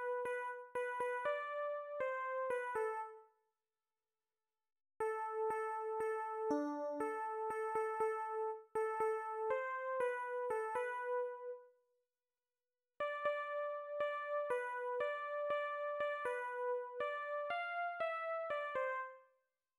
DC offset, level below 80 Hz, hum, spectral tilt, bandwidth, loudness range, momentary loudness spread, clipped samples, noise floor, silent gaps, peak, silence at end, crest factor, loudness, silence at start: under 0.1%; -84 dBFS; none; -4 dB/octave; 15.5 kHz; 4 LU; 4 LU; under 0.1%; under -90 dBFS; none; -26 dBFS; 0.55 s; 16 dB; -41 LUFS; 0 s